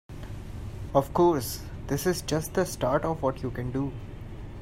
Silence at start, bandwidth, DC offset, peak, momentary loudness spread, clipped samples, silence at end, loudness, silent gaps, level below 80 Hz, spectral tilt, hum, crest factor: 0.1 s; 16 kHz; under 0.1%; -8 dBFS; 17 LU; under 0.1%; 0 s; -28 LUFS; none; -42 dBFS; -5.5 dB/octave; none; 20 dB